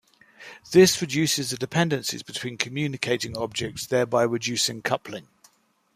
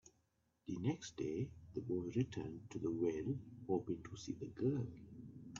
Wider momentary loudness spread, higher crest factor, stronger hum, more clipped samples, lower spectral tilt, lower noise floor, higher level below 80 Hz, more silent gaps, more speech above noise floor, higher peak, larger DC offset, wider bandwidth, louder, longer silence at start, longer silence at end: first, 13 LU vs 10 LU; first, 24 dB vs 18 dB; neither; neither; second, -4 dB/octave vs -8 dB/octave; second, -63 dBFS vs -81 dBFS; first, -62 dBFS vs -70 dBFS; neither; about the same, 38 dB vs 39 dB; first, -2 dBFS vs -26 dBFS; neither; first, 15.5 kHz vs 7.4 kHz; first, -24 LUFS vs -43 LUFS; first, 0.4 s vs 0.05 s; first, 0.75 s vs 0 s